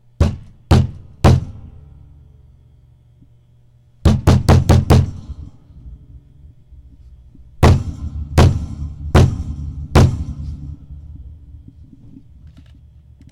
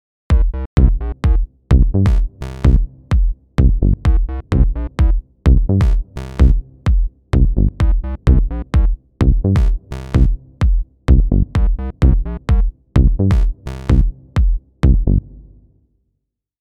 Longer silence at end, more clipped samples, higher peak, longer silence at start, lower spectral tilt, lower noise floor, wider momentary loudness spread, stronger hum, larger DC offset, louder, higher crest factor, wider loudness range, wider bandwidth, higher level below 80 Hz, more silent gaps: first, 1.95 s vs 1.4 s; neither; about the same, -2 dBFS vs 0 dBFS; about the same, 0.2 s vs 0.3 s; second, -7 dB/octave vs -9 dB/octave; second, -50 dBFS vs -74 dBFS; first, 23 LU vs 6 LU; neither; neither; about the same, -16 LUFS vs -17 LUFS; about the same, 14 dB vs 14 dB; first, 6 LU vs 1 LU; first, 14 kHz vs 5.6 kHz; second, -26 dBFS vs -16 dBFS; second, none vs 0.66-0.77 s